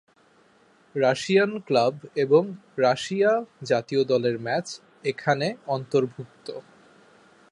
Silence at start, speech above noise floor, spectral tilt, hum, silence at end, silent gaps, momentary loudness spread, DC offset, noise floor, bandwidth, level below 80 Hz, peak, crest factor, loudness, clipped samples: 0.95 s; 36 dB; -5.5 dB/octave; none; 0.9 s; none; 14 LU; under 0.1%; -59 dBFS; 11 kHz; -72 dBFS; -6 dBFS; 18 dB; -24 LUFS; under 0.1%